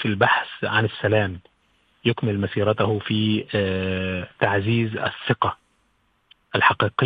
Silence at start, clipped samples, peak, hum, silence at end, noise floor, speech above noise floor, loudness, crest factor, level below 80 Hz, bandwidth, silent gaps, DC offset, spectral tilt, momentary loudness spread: 0 s; under 0.1%; 0 dBFS; none; 0 s; -66 dBFS; 44 dB; -22 LUFS; 22 dB; -58 dBFS; 4.9 kHz; none; under 0.1%; -9 dB/octave; 7 LU